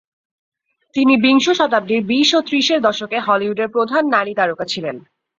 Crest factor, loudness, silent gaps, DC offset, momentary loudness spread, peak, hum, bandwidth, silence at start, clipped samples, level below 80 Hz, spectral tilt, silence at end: 16 dB; -16 LUFS; none; under 0.1%; 10 LU; -2 dBFS; none; 7.6 kHz; 0.95 s; under 0.1%; -62 dBFS; -3.5 dB/octave; 0.4 s